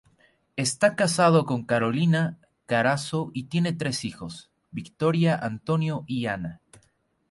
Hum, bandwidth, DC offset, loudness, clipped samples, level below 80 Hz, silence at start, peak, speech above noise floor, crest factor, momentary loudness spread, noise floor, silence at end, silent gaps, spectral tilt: none; 11.5 kHz; under 0.1%; -25 LUFS; under 0.1%; -60 dBFS; 0.55 s; -8 dBFS; 43 dB; 18 dB; 17 LU; -68 dBFS; 0.75 s; none; -5.5 dB/octave